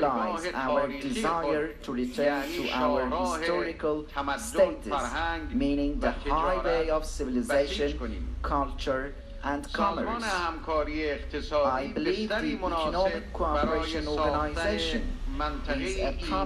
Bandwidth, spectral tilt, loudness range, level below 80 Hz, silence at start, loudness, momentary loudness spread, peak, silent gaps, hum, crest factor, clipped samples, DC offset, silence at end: 14.5 kHz; -5 dB/octave; 2 LU; -38 dBFS; 0 s; -29 LUFS; 6 LU; -12 dBFS; none; none; 18 dB; under 0.1%; under 0.1%; 0 s